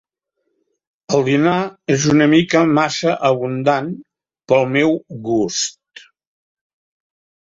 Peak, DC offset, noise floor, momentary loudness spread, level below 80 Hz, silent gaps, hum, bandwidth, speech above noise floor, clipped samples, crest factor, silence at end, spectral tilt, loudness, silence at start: -2 dBFS; under 0.1%; -73 dBFS; 8 LU; -56 dBFS; none; none; 7.8 kHz; 57 dB; under 0.1%; 16 dB; 1.85 s; -5 dB/octave; -16 LUFS; 1.1 s